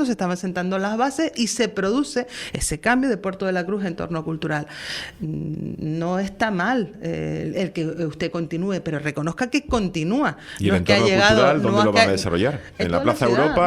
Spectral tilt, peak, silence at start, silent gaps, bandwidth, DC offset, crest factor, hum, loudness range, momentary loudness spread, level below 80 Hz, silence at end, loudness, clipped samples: -5 dB/octave; 0 dBFS; 0 s; none; 15 kHz; under 0.1%; 22 dB; none; 7 LU; 11 LU; -44 dBFS; 0 s; -22 LUFS; under 0.1%